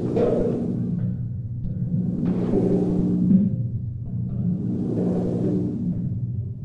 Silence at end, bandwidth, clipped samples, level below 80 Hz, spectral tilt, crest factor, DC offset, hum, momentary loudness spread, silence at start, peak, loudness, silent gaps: 0 s; 4.2 kHz; under 0.1%; -42 dBFS; -11.5 dB/octave; 16 dB; under 0.1%; none; 9 LU; 0 s; -8 dBFS; -24 LUFS; none